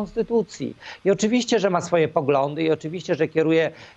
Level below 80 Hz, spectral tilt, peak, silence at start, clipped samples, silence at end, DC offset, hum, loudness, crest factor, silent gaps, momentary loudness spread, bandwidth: -58 dBFS; -5.5 dB/octave; -6 dBFS; 0 s; under 0.1%; 0.1 s; under 0.1%; none; -22 LUFS; 16 dB; none; 7 LU; 8.6 kHz